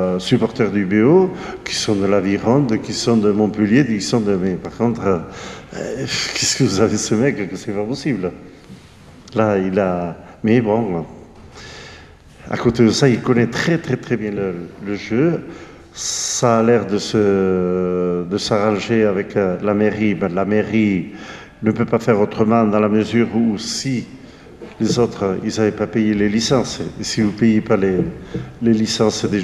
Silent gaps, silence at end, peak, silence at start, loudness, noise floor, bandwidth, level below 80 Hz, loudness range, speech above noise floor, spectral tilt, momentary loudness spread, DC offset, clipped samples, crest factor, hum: none; 0 s; 0 dBFS; 0 s; -18 LUFS; -42 dBFS; 13 kHz; -48 dBFS; 3 LU; 25 dB; -5.5 dB/octave; 12 LU; under 0.1%; under 0.1%; 16 dB; none